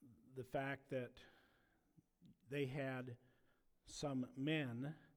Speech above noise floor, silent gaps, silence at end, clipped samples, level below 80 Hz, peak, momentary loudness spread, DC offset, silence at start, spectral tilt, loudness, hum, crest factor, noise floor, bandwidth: 32 dB; none; 0.1 s; under 0.1%; -76 dBFS; -28 dBFS; 14 LU; under 0.1%; 0 s; -6 dB/octave; -46 LUFS; none; 20 dB; -78 dBFS; 19.5 kHz